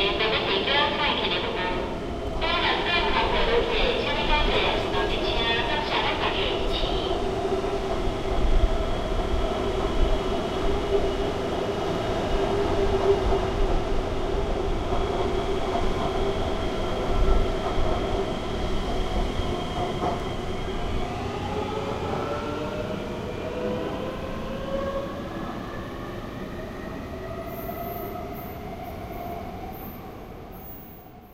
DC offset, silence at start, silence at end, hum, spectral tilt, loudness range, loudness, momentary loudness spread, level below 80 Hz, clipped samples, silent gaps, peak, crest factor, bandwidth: under 0.1%; 0 s; 0 s; none; -5.5 dB/octave; 11 LU; -27 LUFS; 12 LU; -30 dBFS; under 0.1%; none; -6 dBFS; 18 dB; 16 kHz